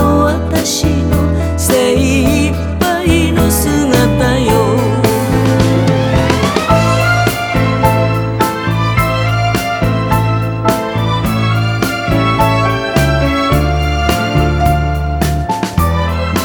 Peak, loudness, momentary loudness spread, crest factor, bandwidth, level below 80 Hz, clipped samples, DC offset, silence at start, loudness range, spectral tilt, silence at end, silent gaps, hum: 0 dBFS; -13 LUFS; 4 LU; 12 dB; over 20 kHz; -22 dBFS; under 0.1%; under 0.1%; 0 s; 2 LU; -5.5 dB/octave; 0 s; none; none